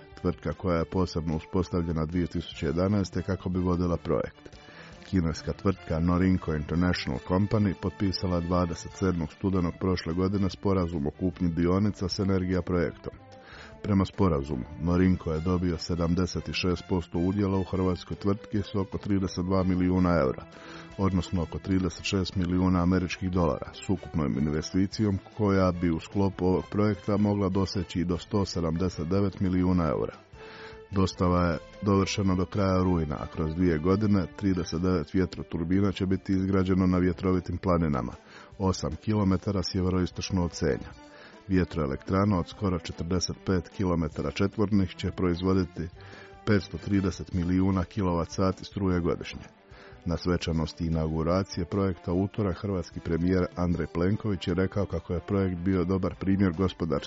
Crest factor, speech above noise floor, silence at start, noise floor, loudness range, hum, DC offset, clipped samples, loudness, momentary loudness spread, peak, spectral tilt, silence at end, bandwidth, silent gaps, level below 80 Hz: 16 dB; 20 dB; 0 s; -47 dBFS; 2 LU; none; under 0.1%; under 0.1%; -28 LUFS; 7 LU; -12 dBFS; -7 dB/octave; 0 s; 7.6 kHz; none; -48 dBFS